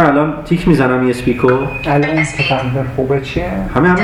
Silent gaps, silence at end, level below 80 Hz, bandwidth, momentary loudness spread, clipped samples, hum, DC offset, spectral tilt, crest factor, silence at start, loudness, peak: none; 0 s; -32 dBFS; 13.5 kHz; 6 LU; under 0.1%; none; under 0.1%; -7 dB/octave; 14 dB; 0 s; -14 LUFS; 0 dBFS